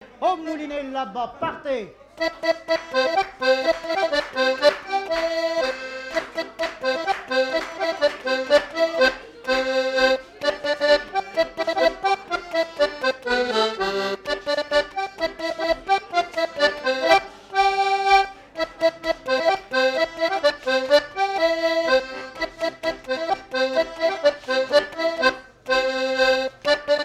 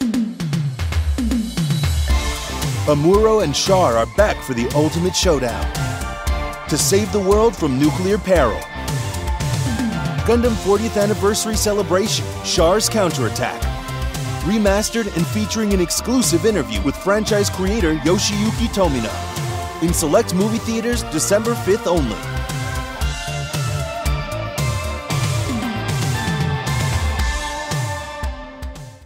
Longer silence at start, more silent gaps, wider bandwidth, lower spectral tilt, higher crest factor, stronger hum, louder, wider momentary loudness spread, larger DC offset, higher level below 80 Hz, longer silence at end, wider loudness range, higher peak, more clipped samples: about the same, 0 s vs 0 s; neither; second, 14.5 kHz vs 16 kHz; second, -2.5 dB/octave vs -4.5 dB/octave; about the same, 16 dB vs 18 dB; neither; second, -22 LUFS vs -19 LUFS; about the same, 9 LU vs 9 LU; neither; second, -54 dBFS vs -28 dBFS; about the same, 0 s vs 0 s; about the same, 3 LU vs 5 LU; second, -6 dBFS vs -2 dBFS; neither